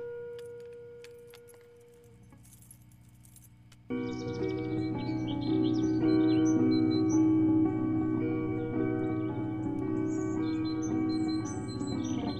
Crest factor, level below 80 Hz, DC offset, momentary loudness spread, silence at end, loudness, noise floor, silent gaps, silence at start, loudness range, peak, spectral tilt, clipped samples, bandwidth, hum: 14 dB; -56 dBFS; under 0.1%; 17 LU; 0 s; -30 LUFS; -56 dBFS; none; 0 s; 16 LU; -16 dBFS; -7 dB/octave; under 0.1%; 12 kHz; 60 Hz at -40 dBFS